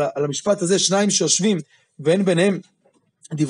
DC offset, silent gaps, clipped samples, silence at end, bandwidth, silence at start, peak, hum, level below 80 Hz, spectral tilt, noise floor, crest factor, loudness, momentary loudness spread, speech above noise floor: under 0.1%; none; under 0.1%; 0 s; 11 kHz; 0 s; -4 dBFS; none; -70 dBFS; -4 dB/octave; -62 dBFS; 16 dB; -19 LUFS; 9 LU; 43 dB